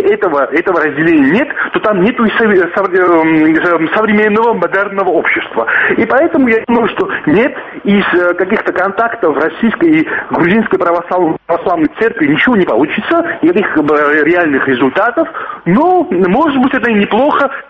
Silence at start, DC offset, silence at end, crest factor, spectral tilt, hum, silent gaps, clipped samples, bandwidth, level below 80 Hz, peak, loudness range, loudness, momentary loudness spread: 0 s; under 0.1%; 0.05 s; 10 dB; -8 dB/octave; none; none; under 0.1%; 5.8 kHz; -46 dBFS; 0 dBFS; 2 LU; -11 LUFS; 4 LU